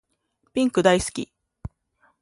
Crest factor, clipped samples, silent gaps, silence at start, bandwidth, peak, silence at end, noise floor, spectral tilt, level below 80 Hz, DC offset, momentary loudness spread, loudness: 22 dB; under 0.1%; none; 0.55 s; 11.5 kHz; -4 dBFS; 0.55 s; -71 dBFS; -4.5 dB/octave; -48 dBFS; under 0.1%; 23 LU; -22 LUFS